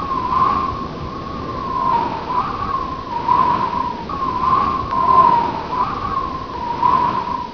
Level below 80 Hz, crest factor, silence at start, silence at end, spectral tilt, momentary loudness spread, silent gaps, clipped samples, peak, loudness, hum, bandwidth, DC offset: -38 dBFS; 18 dB; 0 s; 0 s; -6.5 dB/octave; 11 LU; none; under 0.1%; -2 dBFS; -19 LUFS; none; 5.4 kHz; 0.4%